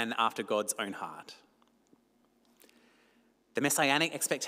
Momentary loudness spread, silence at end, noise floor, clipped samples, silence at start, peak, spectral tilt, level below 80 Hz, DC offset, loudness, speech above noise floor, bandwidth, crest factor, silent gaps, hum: 17 LU; 0 s; -70 dBFS; under 0.1%; 0 s; -12 dBFS; -2 dB/octave; -86 dBFS; under 0.1%; -31 LUFS; 38 dB; 16 kHz; 24 dB; none; 50 Hz at -80 dBFS